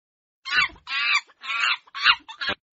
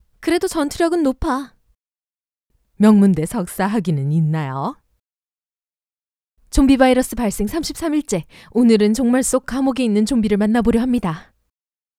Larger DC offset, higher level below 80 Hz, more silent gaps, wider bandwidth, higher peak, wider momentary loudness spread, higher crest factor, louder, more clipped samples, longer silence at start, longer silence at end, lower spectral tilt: neither; second, -60 dBFS vs -36 dBFS; second, none vs 5.92-5.96 s; second, 8 kHz vs 15.5 kHz; second, -4 dBFS vs 0 dBFS; about the same, 9 LU vs 11 LU; about the same, 22 dB vs 18 dB; second, -22 LUFS vs -18 LUFS; neither; first, 0.45 s vs 0.2 s; second, 0.2 s vs 0.75 s; second, 4 dB/octave vs -6 dB/octave